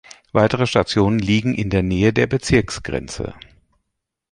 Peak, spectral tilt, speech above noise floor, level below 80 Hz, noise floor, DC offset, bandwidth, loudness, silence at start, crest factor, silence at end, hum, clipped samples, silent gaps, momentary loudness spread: -2 dBFS; -6 dB/octave; 59 dB; -38 dBFS; -77 dBFS; under 0.1%; 11.5 kHz; -19 LUFS; 0.35 s; 18 dB; 1 s; none; under 0.1%; none; 10 LU